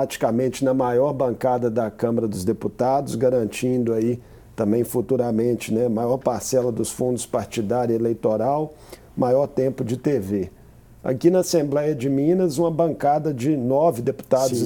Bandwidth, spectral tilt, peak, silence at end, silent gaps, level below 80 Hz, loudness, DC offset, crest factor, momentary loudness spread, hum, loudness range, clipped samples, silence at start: over 20 kHz; -6.5 dB/octave; -4 dBFS; 0 s; none; -54 dBFS; -22 LUFS; under 0.1%; 16 dB; 6 LU; none; 2 LU; under 0.1%; 0 s